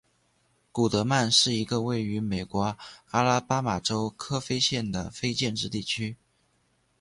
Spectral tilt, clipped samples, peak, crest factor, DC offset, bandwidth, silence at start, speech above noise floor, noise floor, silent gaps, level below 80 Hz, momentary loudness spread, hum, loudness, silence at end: -4 dB/octave; under 0.1%; -8 dBFS; 20 dB; under 0.1%; 11.5 kHz; 0.75 s; 42 dB; -69 dBFS; none; -54 dBFS; 10 LU; none; -27 LUFS; 0.85 s